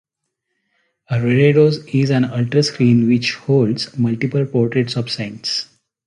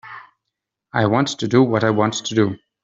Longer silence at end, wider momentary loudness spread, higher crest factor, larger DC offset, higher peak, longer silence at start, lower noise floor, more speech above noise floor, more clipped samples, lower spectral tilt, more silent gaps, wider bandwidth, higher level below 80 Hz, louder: first, 0.4 s vs 0.25 s; about the same, 9 LU vs 7 LU; about the same, 16 dB vs 18 dB; neither; about the same, -2 dBFS vs -2 dBFS; first, 1.1 s vs 0.05 s; second, -76 dBFS vs -81 dBFS; about the same, 60 dB vs 63 dB; neither; about the same, -6.5 dB/octave vs -5.5 dB/octave; neither; first, 10.5 kHz vs 7.8 kHz; about the same, -54 dBFS vs -58 dBFS; about the same, -17 LUFS vs -19 LUFS